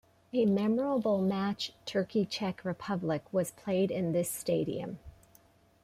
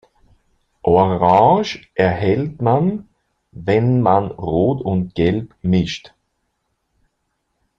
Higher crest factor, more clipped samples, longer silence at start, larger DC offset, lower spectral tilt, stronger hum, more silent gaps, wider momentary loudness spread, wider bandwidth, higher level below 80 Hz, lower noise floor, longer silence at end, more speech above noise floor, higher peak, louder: about the same, 14 dB vs 18 dB; neither; second, 0.35 s vs 0.85 s; neither; second, -6 dB/octave vs -8 dB/octave; neither; neither; second, 7 LU vs 11 LU; first, 15.5 kHz vs 7.4 kHz; second, -66 dBFS vs -46 dBFS; second, -63 dBFS vs -71 dBFS; second, 0.7 s vs 1.7 s; second, 32 dB vs 55 dB; second, -18 dBFS vs 0 dBFS; second, -32 LUFS vs -17 LUFS